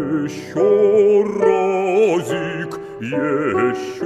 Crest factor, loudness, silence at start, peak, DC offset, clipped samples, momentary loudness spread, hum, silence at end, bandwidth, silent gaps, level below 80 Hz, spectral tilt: 16 dB; -17 LUFS; 0 s; -2 dBFS; under 0.1%; under 0.1%; 11 LU; none; 0 s; 12 kHz; none; -58 dBFS; -6.5 dB/octave